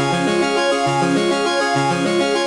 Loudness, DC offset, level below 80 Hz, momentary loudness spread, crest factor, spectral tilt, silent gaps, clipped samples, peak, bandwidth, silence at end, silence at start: -17 LUFS; under 0.1%; -56 dBFS; 1 LU; 12 dB; -4.5 dB/octave; none; under 0.1%; -6 dBFS; 11.5 kHz; 0 s; 0 s